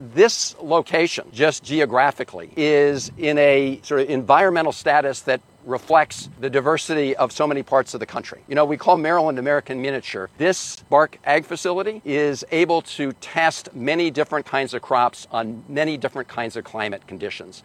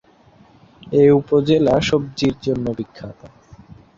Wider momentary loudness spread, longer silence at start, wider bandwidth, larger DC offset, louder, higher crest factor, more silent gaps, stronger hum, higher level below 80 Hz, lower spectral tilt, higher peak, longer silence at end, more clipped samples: second, 11 LU vs 17 LU; second, 0 s vs 0.85 s; first, 13.5 kHz vs 7.6 kHz; neither; second, -20 LUFS vs -17 LUFS; about the same, 18 dB vs 16 dB; neither; neither; second, -64 dBFS vs -46 dBFS; second, -4 dB/octave vs -6.5 dB/octave; about the same, -2 dBFS vs -4 dBFS; second, 0.05 s vs 0.7 s; neither